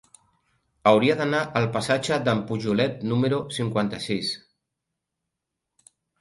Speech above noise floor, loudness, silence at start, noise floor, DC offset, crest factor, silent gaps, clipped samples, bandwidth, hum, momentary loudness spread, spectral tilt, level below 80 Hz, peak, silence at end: 60 dB; -24 LUFS; 0.85 s; -83 dBFS; under 0.1%; 22 dB; none; under 0.1%; 11.5 kHz; none; 7 LU; -5.5 dB/octave; -60 dBFS; -4 dBFS; 1.85 s